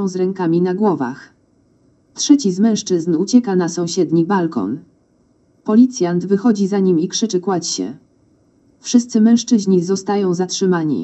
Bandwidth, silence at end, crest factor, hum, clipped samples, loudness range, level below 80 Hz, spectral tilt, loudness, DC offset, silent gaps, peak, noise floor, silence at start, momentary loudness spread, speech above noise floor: 8.4 kHz; 0 s; 16 dB; none; under 0.1%; 1 LU; -66 dBFS; -5.5 dB/octave; -16 LUFS; under 0.1%; none; 0 dBFS; -57 dBFS; 0 s; 10 LU; 41 dB